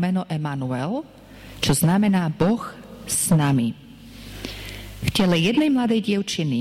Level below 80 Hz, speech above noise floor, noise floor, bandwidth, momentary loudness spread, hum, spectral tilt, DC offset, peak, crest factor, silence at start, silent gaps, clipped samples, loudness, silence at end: -46 dBFS; 20 dB; -41 dBFS; 16.5 kHz; 17 LU; none; -5 dB/octave; under 0.1%; -10 dBFS; 12 dB; 0 s; none; under 0.1%; -21 LUFS; 0 s